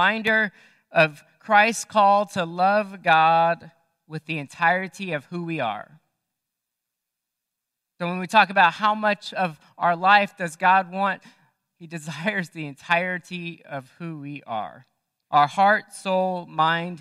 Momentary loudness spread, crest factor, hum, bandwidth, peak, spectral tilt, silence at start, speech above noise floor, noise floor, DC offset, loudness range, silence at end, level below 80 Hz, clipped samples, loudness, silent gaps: 16 LU; 22 dB; none; 13.5 kHz; -2 dBFS; -4.5 dB/octave; 0 s; 62 dB; -84 dBFS; under 0.1%; 9 LU; 0.05 s; -76 dBFS; under 0.1%; -22 LUFS; none